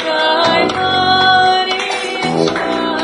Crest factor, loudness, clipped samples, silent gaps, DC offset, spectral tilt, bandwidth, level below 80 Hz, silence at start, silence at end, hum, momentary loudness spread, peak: 14 dB; -13 LUFS; under 0.1%; none; under 0.1%; -3.5 dB/octave; 11 kHz; -50 dBFS; 0 s; 0 s; none; 7 LU; 0 dBFS